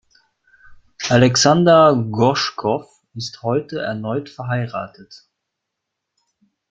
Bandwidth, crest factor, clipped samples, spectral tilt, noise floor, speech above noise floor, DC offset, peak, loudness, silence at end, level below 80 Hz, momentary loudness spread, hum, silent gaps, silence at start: 9.2 kHz; 18 dB; under 0.1%; -5 dB/octave; -80 dBFS; 63 dB; under 0.1%; -2 dBFS; -17 LUFS; 1.55 s; -54 dBFS; 18 LU; none; none; 0.7 s